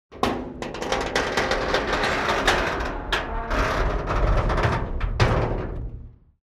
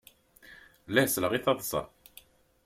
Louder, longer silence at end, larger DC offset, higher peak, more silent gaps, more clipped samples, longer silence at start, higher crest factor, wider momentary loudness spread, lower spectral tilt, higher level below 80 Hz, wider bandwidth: first, -24 LUFS vs -28 LUFS; second, 0.3 s vs 0.8 s; neither; about the same, -6 dBFS vs -8 dBFS; neither; neither; second, 0.1 s vs 0.45 s; second, 18 dB vs 24 dB; about the same, 10 LU vs 9 LU; first, -5 dB/octave vs -3.5 dB/octave; first, -30 dBFS vs -62 dBFS; second, 13.5 kHz vs 16.5 kHz